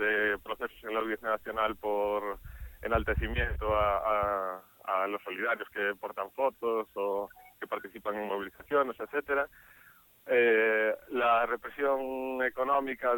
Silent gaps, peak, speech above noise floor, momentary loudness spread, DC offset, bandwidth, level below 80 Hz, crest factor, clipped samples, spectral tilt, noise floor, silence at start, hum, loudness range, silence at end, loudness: none; -14 dBFS; 29 dB; 11 LU; under 0.1%; 17.5 kHz; -48 dBFS; 18 dB; under 0.1%; -6.5 dB/octave; -59 dBFS; 0 s; none; 5 LU; 0 s; -31 LUFS